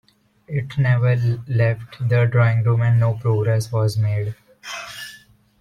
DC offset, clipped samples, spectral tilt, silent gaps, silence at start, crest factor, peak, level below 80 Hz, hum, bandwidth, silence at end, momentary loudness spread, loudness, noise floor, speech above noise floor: under 0.1%; under 0.1%; -7 dB/octave; none; 0.5 s; 14 dB; -6 dBFS; -52 dBFS; none; 11.5 kHz; 0.45 s; 15 LU; -20 LUFS; -48 dBFS; 30 dB